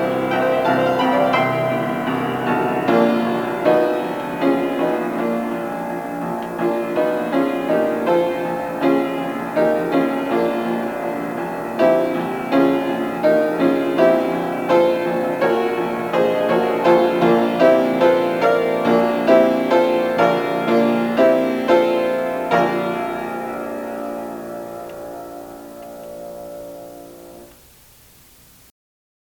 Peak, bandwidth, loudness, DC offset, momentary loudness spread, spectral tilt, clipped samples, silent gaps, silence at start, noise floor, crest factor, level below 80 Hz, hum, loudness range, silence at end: -2 dBFS; 19.5 kHz; -18 LUFS; under 0.1%; 15 LU; -6.5 dB/octave; under 0.1%; none; 0 s; -48 dBFS; 16 dB; -56 dBFS; none; 14 LU; 1.8 s